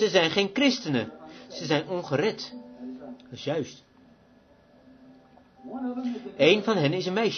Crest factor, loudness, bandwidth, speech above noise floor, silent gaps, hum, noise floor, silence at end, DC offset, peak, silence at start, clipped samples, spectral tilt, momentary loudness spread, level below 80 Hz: 24 dB; -26 LUFS; 6.6 kHz; 32 dB; none; none; -58 dBFS; 0 s; under 0.1%; -4 dBFS; 0 s; under 0.1%; -5 dB/octave; 20 LU; -68 dBFS